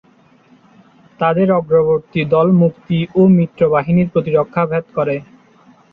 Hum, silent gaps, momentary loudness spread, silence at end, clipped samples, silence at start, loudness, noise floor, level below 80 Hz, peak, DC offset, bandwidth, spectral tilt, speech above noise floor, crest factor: none; none; 8 LU; 0.7 s; under 0.1%; 1.2 s; -15 LUFS; -50 dBFS; -52 dBFS; -2 dBFS; under 0.1%; 4.2 kHz; -10.5 dB/octave; 36 dB; 14 dB